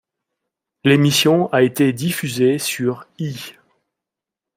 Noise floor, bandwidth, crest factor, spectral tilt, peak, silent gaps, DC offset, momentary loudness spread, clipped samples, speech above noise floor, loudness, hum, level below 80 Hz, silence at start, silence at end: -86 dBFS; 16 kHz; 18 dB; -5 dB/octave; -2 dBFS; none; under 0.1%; 14 LU; under 0.1%; 69 dB; -17 LUFS; none; -62 dBFS; 0.85 s; 1.05 s